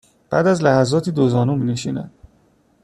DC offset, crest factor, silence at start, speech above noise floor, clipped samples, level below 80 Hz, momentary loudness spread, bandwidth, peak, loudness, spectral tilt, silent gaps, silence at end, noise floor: under 0.1%; 16 dB; 0.3 s; 40 dB; under 0.1%; -54 dBFS; 11 LU; 11.5 kHz; -4 dBFS; -18 LUFS; -6.5 dB/octave; none; 0.75 s; -57 dBFS